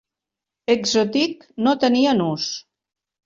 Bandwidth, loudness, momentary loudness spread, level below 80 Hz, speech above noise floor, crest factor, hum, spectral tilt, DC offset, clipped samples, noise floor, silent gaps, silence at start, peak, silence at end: 7.8 kHz; -20 LUFS; 10 LU; -62 dBFS; 67 dB; 18 dB; none; -4.5 dB/octave; under 0.1%; under 0.1%; -86 dBFS; none; 0.7 s; -4 dBFS; 0.65 s